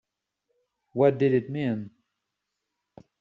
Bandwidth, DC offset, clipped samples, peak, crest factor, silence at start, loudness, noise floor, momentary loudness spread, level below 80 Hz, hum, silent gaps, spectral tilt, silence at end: 5.8 kHz; under 0.1%; under 0.1%; -8 dBFS; 20 dB; 0.95 s; -25 LUFS; -83 dBFS; 15 LU; -70 dBFS; none; none; -7.5 dB/octave; 1.3 s